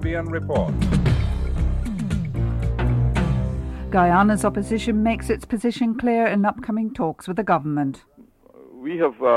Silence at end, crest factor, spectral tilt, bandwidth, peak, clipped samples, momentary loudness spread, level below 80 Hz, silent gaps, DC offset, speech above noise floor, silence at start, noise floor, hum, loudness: 0 s; 14 dB; -7.5 dB/octave; 12.5 kHz; -6 dBFS; under 0.1%; 7 LU; -30 dBFS; none; under 0.1%; 29 dB; 0 s; -50 dBFS; none; -22 LUFS